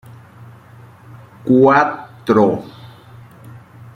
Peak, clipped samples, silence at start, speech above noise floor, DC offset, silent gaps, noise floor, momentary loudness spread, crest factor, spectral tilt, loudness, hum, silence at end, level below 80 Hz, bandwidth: 0 dBFS; under 0.1%; 0.4 s; 29 dB; under 0.1%; none; -42 dBFS; 17 LU; 18 dB; -8 dB/octave; -14 LUFS; none; 0.4 s; -56 dBFS; 10 kHz